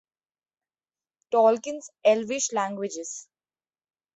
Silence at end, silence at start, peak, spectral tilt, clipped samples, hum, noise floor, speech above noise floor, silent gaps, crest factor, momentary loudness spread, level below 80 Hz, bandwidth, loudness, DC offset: 0.95 s; 1.3 s; -6 dBFS; -3 dB/octave; under 0.1%; none; under -90 dBFS; over 65 dB; none; 22 dB; 15 LU; -78 dBFS; 8.2 kHz; -25 LUFS; under 0.1%